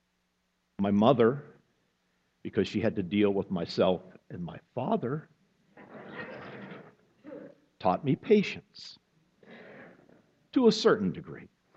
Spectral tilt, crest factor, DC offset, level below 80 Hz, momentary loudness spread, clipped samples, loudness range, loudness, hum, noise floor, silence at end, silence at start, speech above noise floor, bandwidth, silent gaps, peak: -6.5 dB/octave; 22 dB; under 0.1%; -68 dBFS; 24 LU; under 0.1%; 9 LU; -28 LUFS; none; -76 dBFS; 0.3 s; 0.8 s; 49 dB; 8 kHz; none; -8 dBFS